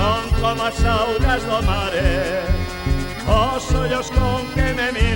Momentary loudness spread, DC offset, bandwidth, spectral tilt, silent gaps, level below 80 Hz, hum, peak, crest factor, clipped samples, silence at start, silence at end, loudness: 5 LU; under 0.1%; 17 kHz; -5.5 dB/octave; none; -22 dBFS; none; -2 dBFS; 16 dB; under 0.1%; 0 s; 0 s; -20 LUFS